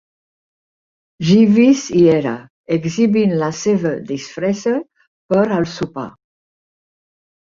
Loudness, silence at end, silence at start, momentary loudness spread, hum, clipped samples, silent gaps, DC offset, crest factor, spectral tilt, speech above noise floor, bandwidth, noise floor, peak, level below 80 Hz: -16 LUFS; 1.45 s; 1.2 s; 13 LU; none; under 0.1%; 2.50-2.64 s, 5.08-5.29 s; under 0.1%; 16 dB; -6.5 dB/octave; over 75 dB; 7.6 kHz; under -90 dBFS; -2 dBFS; -54 dBFS